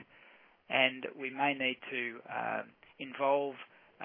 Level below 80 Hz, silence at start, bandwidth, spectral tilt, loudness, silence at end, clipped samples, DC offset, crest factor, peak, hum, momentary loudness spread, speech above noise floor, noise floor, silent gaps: -86 dBFS; 0 s; 3.7 kHz; -7 dB/octave; -33 LUFS; 0 s; under 0.1%; under 0.1%; 24 dB; -12 dBFS; none; 17 LU; 27 dB; -62 dBFS; none